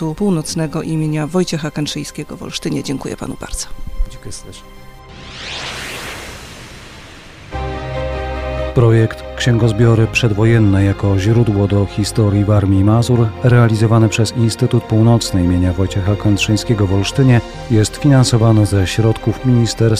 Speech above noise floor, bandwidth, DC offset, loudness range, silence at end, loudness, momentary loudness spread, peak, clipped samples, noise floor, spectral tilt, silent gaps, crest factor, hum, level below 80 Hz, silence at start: 22 dB; 14 kHz; under 0.1%; 14 LU; 0 s; -15 LUFS; 16 LU; -2 dBFS; under 0.1%; -36 dBFS; -6.5 dB/octave; none; 12 dB; none; -32 dBFS; 0 s